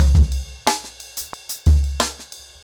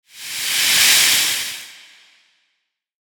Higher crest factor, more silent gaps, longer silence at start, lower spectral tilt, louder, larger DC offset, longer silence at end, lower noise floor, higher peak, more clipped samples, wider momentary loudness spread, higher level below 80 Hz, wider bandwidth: second, 14 dB vs 20 dB; neither; second, 0 s vs 0.15 s; first, -4.5 dB/octave vs 2.5 dB/octave; second, -21 LUFS vs -13 LUFS; neither; second, 0.25 s vs 1.4 s; second, -40 dBFS vs -73 dBFS; second, -4 dBFS vs 0 dBFS; neither; second, 13 LU vs 17 LU; first, -20 dBFS vs -64 dBFS; about the same, over 20 kHz vs 19.5 kHz